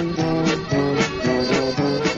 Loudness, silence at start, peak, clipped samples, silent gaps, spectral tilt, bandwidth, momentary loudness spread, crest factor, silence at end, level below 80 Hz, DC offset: -20 LUFS; 0 s; -6 dBFS; under 0.1%; none; -5.5 dB/octave; 8.2 kHz; 2 LU; 14 dB; 0 s; -44 dBFS; under 0.1%